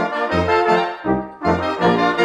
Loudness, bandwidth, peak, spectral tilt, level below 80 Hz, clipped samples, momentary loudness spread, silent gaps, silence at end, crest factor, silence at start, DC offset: -18 LUFS; 10.5 kHz; -2 dBFS; -6.5 dB/octave; -42 dBFS; under 0.1%; 5 LU; none; 0 s; 14 dB; 0 s; under 0.1%